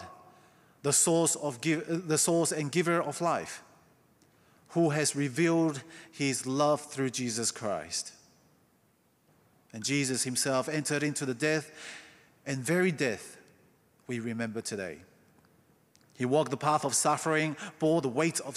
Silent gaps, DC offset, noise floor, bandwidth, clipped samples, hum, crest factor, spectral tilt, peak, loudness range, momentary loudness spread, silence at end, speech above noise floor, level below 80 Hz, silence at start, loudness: none; under 0.1%; -69 dBFS; 14.5 kHz; under 0.1%; none; 18 dB; -4 dB/octave; -12 dBFS; 6 LU; 15 LU; 0 s; 39 dB; -78 dBFS; 0 s; -29 LUFS